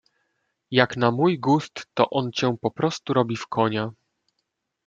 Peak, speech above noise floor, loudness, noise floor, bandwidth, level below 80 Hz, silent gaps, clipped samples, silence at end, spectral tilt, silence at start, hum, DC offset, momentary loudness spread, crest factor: -2 dBFS; 55 dB; -23 LUFS; -78 dBFS; 7.8 kHz; -64 dBFS; none; under 0.1%; 0.95 s; -6 dB/octave; 0.7 s; none; under 0.1%; 6 LU; 22 dB